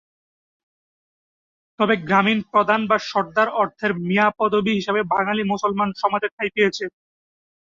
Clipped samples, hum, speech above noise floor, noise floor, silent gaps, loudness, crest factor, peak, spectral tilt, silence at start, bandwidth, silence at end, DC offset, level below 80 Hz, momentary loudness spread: under 0.1%; none; over 70 dB; under -90 dBFS; 6.32-6.38 s; -20 LUFS; 18 dB; -4 dBFS; -5.5 dB/octave; 1.8 s; 7.6 kHz; 0.85 s; under 0.1%; -62 dBFS; 5 LU